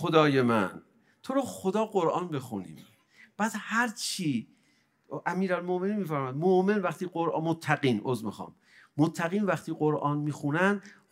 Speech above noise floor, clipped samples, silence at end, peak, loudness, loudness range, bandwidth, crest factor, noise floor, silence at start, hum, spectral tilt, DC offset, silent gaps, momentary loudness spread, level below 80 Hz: 40 dB; under 0.1%; 0.2 s; -6 dBFS; -29 LUFS; 4 LU; 16 kHz; 22 dB; -68 dBFS; 0 s; none; -6 dB/octave; under 0.1%; none; 11 LU; -76 dBFS